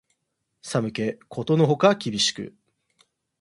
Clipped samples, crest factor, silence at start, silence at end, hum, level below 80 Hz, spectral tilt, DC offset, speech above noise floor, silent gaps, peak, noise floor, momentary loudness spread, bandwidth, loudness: under 0.1%; 22 dB; 0.65 s; 0.95 s; none; -64 dBFS; -5 dB/octave; under 0.1%; 54 dB; none; -2 dBFS; -77 dBFS; 18 LU; 11.5 kHz; -23 LUFS